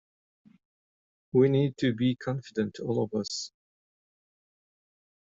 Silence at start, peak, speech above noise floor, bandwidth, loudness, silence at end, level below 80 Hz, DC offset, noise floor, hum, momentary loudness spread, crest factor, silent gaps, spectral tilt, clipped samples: 1.35 s; -12 dBFS; over 63 dB; 7.8 kHz; -28 LUFS; 1.9 s; -68 dBFS; under 0.1%; under -90 dBFS; none; 10 LU; 20 dB; none; -6.5 dB/octave; under 0.1%